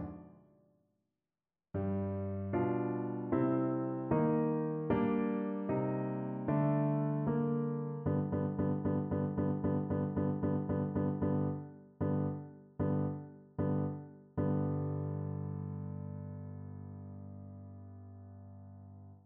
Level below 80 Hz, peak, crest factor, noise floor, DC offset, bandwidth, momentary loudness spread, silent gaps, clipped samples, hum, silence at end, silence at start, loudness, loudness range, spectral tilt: -62 dBFS; -18 dBFS; 18 dB; under -90 dBFS; under 0.1%; 3.3 kHz; 18 LU; none; under 0.1%; none; 0.1 s; 0 s; -35 LUFS; 7 LU; -10.5 dB/octave